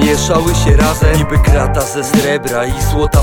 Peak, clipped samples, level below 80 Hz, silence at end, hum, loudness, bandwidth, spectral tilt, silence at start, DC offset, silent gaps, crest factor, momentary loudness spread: 0 dBFS; under 0.1%; -16 dBFS; 0 s; none; -12 LUFS; 18.5 kHz; -5 dB/octave; 0 s; under 0.1%; none; 10 dB; 5 LU